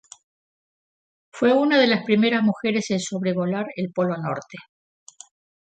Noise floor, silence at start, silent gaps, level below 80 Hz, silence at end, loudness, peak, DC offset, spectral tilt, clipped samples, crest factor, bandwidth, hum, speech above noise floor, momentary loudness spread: under -90 dBFS; 1.35 s; none; -70 dBFS; 1 s; -22 LUFS; -6 dBFS; under 0.1%; -5.5 dB/octave; under 0.1%; 18 dB; 9.2 kHz; none; over 69 dB; 12 LU